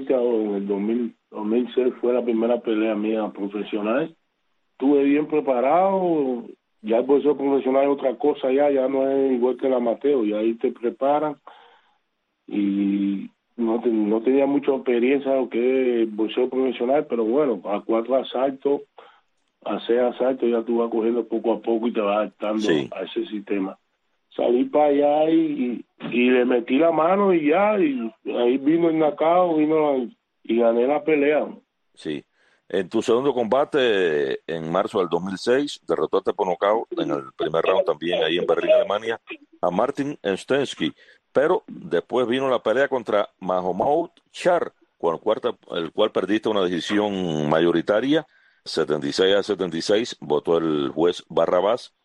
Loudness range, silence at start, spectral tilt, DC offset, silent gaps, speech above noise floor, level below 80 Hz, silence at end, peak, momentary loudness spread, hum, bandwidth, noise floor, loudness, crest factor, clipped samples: 4 LU; 0 s; -6 dB/octave; under 0.1%; none; 53 dB; -66 dBFS; 0.2 s; -6 dBFS; 9 LU; none; 10.5 kHz; -74 dBFS; -22 LUFS; 16 dB; under 0.1%